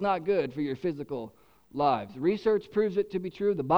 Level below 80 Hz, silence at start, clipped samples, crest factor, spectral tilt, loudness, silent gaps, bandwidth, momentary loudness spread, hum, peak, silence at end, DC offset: -62 dBFS; 0 s; under 0.1%; 18 dB; -8 dB/octave; -29 LUFS; none; 6.4 kHz; 10 LU; none; -10 dBFS; 0 s; under 0.1%